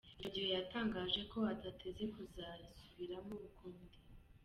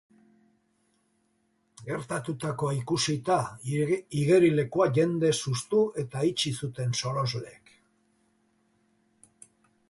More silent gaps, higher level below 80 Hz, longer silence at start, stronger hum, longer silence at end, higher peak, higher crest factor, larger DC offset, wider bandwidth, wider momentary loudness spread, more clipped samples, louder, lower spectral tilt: neither; about the same, -64 dBFS vs -64 dBFS; second, 0.05 s vs 1.8 s; neither; second, 0 s vs 2.4 s; second, -24 dBFS vs -10 dBFS; about the same, 22 dB vs 18 dB; neither; first, 13 kHz vs 11.5 kHz; first, 17 LU vs 10 LU; neither; second, -44 LUFS vs -27 LUFS; about the same, -6 dB/octave vs -5.5 dB/octave